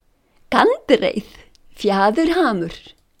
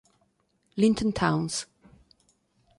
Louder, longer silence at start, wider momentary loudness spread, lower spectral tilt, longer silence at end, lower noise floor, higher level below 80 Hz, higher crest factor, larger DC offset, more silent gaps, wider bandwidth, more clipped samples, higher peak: first, -18 LUFS vs -26 LUFS; second, 0.5 s vs 0.75 s; about the same, 13 LU vs 15 LU; about the same, -5.5 dB/octave vs -5 dB/octave; second, 0.4 s vs 1.15 s; second, -55 dBFS vs -71 dBFS; first, -48 dBFS vs -54 dBFS; about the same, 20 dB vs 20 dB; neither; neither; first, 16 kHz vs 11.5 kHz; neither; first, 0 dBFS vs -8 dBFS